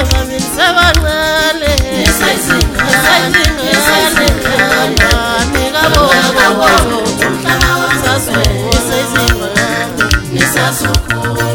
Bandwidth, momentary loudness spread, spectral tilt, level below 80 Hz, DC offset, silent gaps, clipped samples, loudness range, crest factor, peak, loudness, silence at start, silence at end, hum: over 20 kHz; 5 LU; -3.5 dB/octave; -20 dBFS; under 0.1%; none; 0.3%; 2 LU; 10 dB; 0 dBFS; -10 LUFS; 0 s; 0 s; none